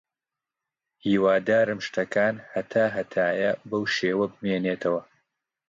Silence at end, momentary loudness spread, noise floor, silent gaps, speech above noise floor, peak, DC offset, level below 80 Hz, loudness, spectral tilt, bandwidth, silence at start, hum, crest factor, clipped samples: 0.65 s; 7 LU; -89 dBFS; none; 64 dB; -10 dBFS; under 0.1%; -66 dBFS; -25 LUFS; -6 dB/octave; 7.6 kHz; 1.05 s; none; 16 dB; under 0.1%